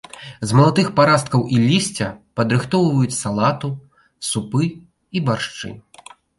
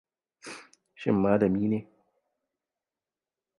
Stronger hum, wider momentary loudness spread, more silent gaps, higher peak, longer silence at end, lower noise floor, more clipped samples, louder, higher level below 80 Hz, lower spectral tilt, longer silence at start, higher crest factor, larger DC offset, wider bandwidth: neither; second, 14 LU vs 21 LU; neither; first, -2 dBFS vs -10 dBFS; second, 0.6 s vs 1.75 s; second, -45 dBFS vs under -90 dBFS; neither; first, -19 LUFS vs -27 LUFS; first, -52 dBFS vs -60 dBFS; second, -5.5 dB/octave vs -8 dB/octave; second, 0.15 s vs 0.45 s; about the same, 16 dB vs 20 dB; neither; about the same, 11.5 kHz vs 11 kHz